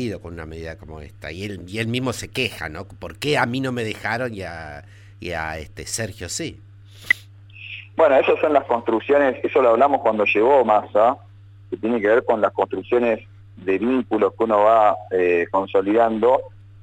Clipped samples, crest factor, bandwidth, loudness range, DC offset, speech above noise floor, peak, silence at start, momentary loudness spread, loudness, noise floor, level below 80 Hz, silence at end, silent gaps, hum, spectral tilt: under 0.1%; 18 dB; 16.5 kHz; 10 LU; under 0.1%; 23 dB; -4 dBFS; 0 s; 19 LU; -20 LUFS; -43 dBFS; -50 dBFS; 0.25 s; none; none; -5 dB/octave